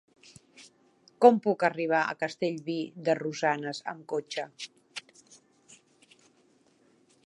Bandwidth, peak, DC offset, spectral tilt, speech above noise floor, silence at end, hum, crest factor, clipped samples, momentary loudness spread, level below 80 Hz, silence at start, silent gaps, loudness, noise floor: 11 kHz; -6 dBFS; under 0.1%; -5 dB/octave; 38 dB; 2.25 s; none; 26 dB; under 0.1%; 19 LU; -84 dBFS; 0.6 s; none; -28 LUFS; -65 dBFS